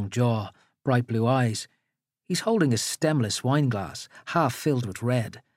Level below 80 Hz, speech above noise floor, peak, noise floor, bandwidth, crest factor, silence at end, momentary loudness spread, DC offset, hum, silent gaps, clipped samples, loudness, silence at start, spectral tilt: -68 dBFS; 56 dB; -10 dBFS; -81 dBFS; 16 kHz; 16 dB; 0.2 s; 11 LU; under 0.1%; none; none; under 0.1%; -26 LUFS; 0 s; -5.5 dB/octave